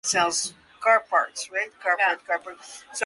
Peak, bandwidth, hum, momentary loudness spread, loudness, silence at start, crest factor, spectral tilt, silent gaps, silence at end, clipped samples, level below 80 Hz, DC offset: -8 dBFS; 11.5 kHz; none; 13 LU; -24 LUFS; 0.05 s; 18 dB; -0.5 dB/octave; none; 0 s; under 0.1%; -70 dBFS; under 0.1%